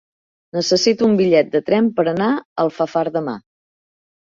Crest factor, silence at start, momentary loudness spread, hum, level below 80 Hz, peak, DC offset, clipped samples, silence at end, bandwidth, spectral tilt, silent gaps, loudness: 16 dB; 0.55 s; 9 LU; none; -62 dBFS; -2 dBFS; under 0.1%; under 0.1%; 0.85 s; 7.6 kHz; -5 dB/octave; 2.45-2.56 s; -17 LUFS